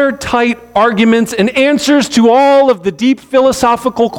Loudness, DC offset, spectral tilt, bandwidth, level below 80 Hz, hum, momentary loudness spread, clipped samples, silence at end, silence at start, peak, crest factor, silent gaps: -10 LUFS; under 0.1%; -4.5 dB/octave; 17 kHz; -44 dBFS; none; 5 LU; under 0.1%; 0 s; 0 s; 0 dBFS; 10 dB; none